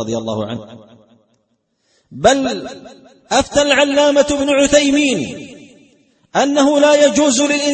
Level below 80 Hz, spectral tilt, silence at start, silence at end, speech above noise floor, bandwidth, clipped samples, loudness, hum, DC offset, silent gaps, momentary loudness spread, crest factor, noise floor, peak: -46 dBFS; -3 dB/octave; 0 s; 0 s; 51 dB; 8.8 kHz; under 0.1%; -14 LUFS; none; under 0.1%; none; 15 LU; 16 dB; -65 dBFS; 0 dBFS